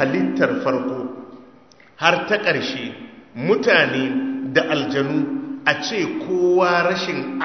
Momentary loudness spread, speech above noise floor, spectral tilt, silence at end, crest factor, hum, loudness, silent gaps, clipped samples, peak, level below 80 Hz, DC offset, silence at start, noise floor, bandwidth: 12 LU; 30 dB; -5 dB/octave; 0 s; 20 dB; none; -20 LUFS; none; under 0.1%; 0 dBFS; -64 dBFS; 0.1%; 0 s; -49 dBFS; 6.4 kHz